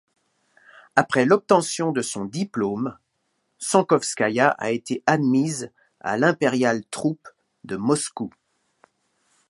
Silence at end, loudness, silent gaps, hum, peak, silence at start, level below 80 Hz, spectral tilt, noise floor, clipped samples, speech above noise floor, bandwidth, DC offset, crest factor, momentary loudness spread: 1.2 s; -22 LUFS; none; none; 0 dBFS; 0.95 s; -68 dBFS; -4.5 dB/octave; -73 dBFS; under 0.1%; 51 dB; 11.5 kHz; under 0.1%; 22 dB; 13 LU